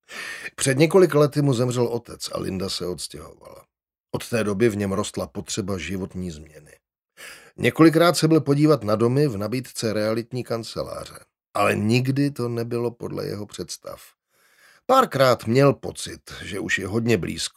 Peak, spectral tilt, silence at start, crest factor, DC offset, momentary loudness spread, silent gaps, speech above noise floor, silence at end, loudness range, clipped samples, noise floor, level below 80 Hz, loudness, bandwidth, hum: -2 dBFS; -5.5 dB/octave; 0.1 s; 20 dB; under 0.1%; 17 LU; 4.00-4.04 s; 38 dB; 0.1 s; 7 LU; under 0.1%; -60 dBFS; -56 dBFS; -22 LUFS; 16 kHz; none